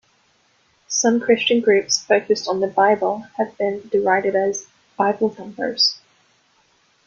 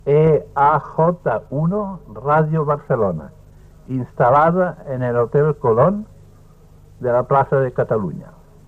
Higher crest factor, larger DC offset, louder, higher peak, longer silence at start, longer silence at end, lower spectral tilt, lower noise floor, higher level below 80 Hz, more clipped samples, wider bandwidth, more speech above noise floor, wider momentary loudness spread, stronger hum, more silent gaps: about the same, 18 dB vs 16 dB; neither; about the same, -19 LUFS vs -18 LUFS; about the same, -2 dBFS vs -2 dBFS; first, 0.9 s vs 0.05 s; first, 1.1 s vs 0.35 s; second, -2.5 dB/octave vs -10 dB/octave; first, -61 dBFS vs -45 dBFS; second, -66 dBFS vs -46 dBFS; neither; first, 7.4 kHz vs 4.1 kHz; first, 42 dB vs 28 dB; second, 8 LU vs 12 LU; second, none vs 50 Hz at -45 dBFS; neither